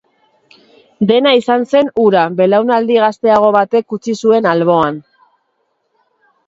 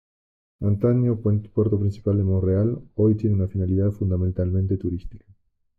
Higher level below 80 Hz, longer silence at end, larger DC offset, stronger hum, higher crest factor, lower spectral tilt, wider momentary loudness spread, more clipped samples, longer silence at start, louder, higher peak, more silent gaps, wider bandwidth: second, -56 dBFS vs -48 dBFS; first, 1.45 s vs 0.6 s; neither; neither; about the same, 14 dB vs 12 dB; second, -6 dB/octave vs -12.5 dB/octave; about the same, 6 LU vs 5 LU; neither; first, 1 s vs 0.6 s; first, -12 LUFS vs -23 LUFS; first, 0 dBFS vs -10 dBFS; neither; first, 7.8 kHz vs 4.4 kHz